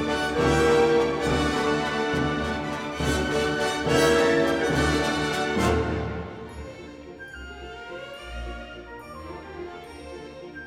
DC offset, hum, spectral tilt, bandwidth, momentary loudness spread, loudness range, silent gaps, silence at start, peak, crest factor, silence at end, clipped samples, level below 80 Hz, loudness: under 0.1%; none; -5 dB/octave; 16 kHz; 20 LU; 15 LU; none; 0 s; -8 dBFS; 16 dB; 0 s; under 0.1%; -40 dBFS; -23 LUFS